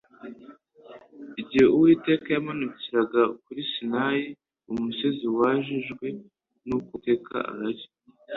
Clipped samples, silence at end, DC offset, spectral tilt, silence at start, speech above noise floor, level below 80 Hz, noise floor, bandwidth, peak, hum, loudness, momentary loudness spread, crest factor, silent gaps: under 0.1%; 0 s; under 0.1%; -7.5 dB/octave; 0.25 s; 26 dB; -64 dBFS; -50 dBFS; 6.8 kHz; -6 dBFS; none; -25 LUFS; 19 LU; 20 dB; none